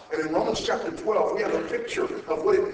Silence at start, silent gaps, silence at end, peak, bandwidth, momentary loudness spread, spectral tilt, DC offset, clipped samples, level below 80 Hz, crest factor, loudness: 0 s; none; 0 s; -12 dBFS; 8 kHz; 5 LU; -4.5 dB/octave; under 0.1%; under 0.1%; -56 dBFS; 14 dB; -26 LUFS